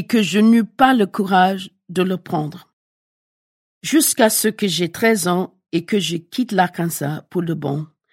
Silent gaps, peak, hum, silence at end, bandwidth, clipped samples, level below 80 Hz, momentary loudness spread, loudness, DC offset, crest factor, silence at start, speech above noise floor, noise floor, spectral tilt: 2.73-3.81 s; 0 dBFS; none; 0.25 s; 16.5 kHz; under 0.1%; -60 dBFS; 11 LU; -18 LUFS; under 0.1%; 18 dB; 0 s; over 72 dB; under -90 dBFS; -4.5 dB/octave